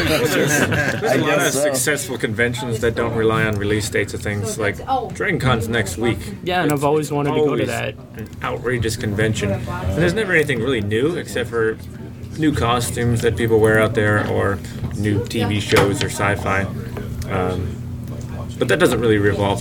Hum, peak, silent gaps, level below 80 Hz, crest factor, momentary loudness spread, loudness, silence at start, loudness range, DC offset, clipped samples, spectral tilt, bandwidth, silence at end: none; -2 dBFS; none; -40 dBFS; 18 dB; 10 LU; -19 LUFS; 0 s; 3 LU; under 0.1%; under 0.1%; -5 dB/octave; 18 kHz; 0 s